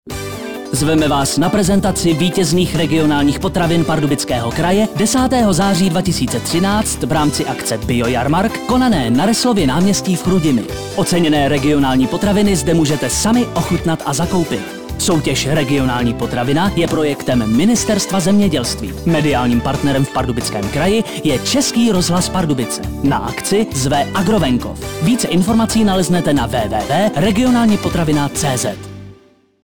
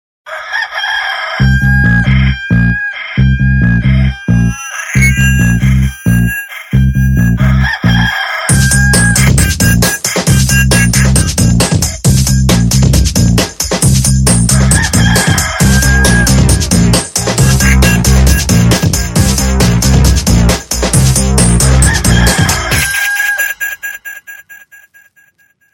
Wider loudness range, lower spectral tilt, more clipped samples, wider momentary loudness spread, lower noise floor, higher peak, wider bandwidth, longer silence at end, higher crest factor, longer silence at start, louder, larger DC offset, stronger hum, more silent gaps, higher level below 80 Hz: about the same, 2 LU vs 3 LU; about the same, -5 dB/octave vs -4 dB/octave; second, under 0.1% vs 0.3%; about the same, 5 LU vs 6 LU; second, -48 dBFS vs -52 dBFS; second, -6 dBFS vs 0 dBFS; first, over 20 kHz vs 17 kHz; second, 0 s vs 1.15 s; about the same, 10 dB vs 10 dB; second, 0.05 s vs 0.25 s; second, -15 LUFS vs -9 LUFS; first, 1% vs under 0.1%; neither; neither; second, -32 dBFS vs -16 dBFS